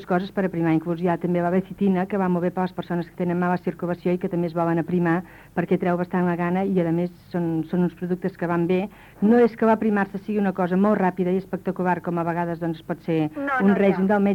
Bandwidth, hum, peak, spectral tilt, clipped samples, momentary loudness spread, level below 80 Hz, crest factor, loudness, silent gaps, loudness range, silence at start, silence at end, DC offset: 5.4 kHz; none; -8 dBFS; -9.5 dB/octave; under 0.1%; 8 LU; -58 dBFS; 16 dB; -23 LUFS; none; 3 LU; 0 s; 0 s; under 0.1%